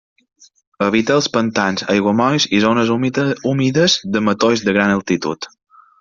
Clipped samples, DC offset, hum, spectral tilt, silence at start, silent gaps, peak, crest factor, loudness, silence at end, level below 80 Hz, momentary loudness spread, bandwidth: under 0.1%; under 0.1%; none; -4.5 dB/octave; 0.8 s; none; 0 dBFS; 16 dB; -16 LUFS; 0.55 s; -54 dBFS; 6 LU; 7.6 kHz